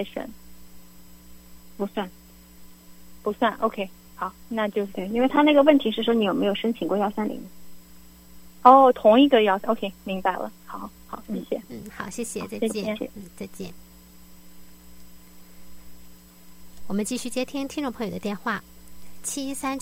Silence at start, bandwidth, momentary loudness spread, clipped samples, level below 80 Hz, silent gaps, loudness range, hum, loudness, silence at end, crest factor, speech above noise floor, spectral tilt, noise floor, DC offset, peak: 0 s; 16.5 kHz; 21 LU; under 0.1%; -56 dBFS; none; 16 LU; none; -23 LUFS; 0 s; 24 dB; 26 dB; -4.5 dB/octave; -49 dBFS; under 0.1%; 0 dBFS